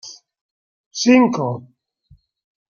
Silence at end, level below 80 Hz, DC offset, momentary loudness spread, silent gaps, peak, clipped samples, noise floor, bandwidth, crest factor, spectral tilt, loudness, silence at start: 1.2 s; -64 dBFS; under 0.1%; 19 LU; 0.41-0.91 s; -2 dBFS; under 0.1%; -54 dBFS; 7.2 kHz; 18 dB; -5 dB/octave; -16 LUFS; 0.05 s